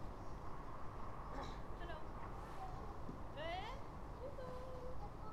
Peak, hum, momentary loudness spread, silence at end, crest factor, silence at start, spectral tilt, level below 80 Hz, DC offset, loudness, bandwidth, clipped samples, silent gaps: -32 dBFS; none; 5 LU; 0 s; 14 dB; 0 s; -6.5 dB/octave; -54 dBFS; under 0.1%; -51 LUFS; 13 kHz; under 0.1%; none